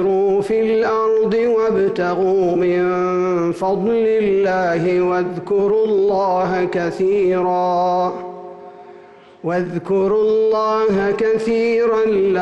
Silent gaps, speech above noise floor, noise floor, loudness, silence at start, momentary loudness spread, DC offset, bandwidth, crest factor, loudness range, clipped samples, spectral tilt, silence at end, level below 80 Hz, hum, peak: none; 26 dB; -42 dBFS; -17 LUFS; 0 s; 5 LU; under 0.1%; 8.6 kHz; 8 dB; 3 LU; under 0.1%; -7.5 dB/octave; 0 s; -52 dBFS; none; -10 dBFS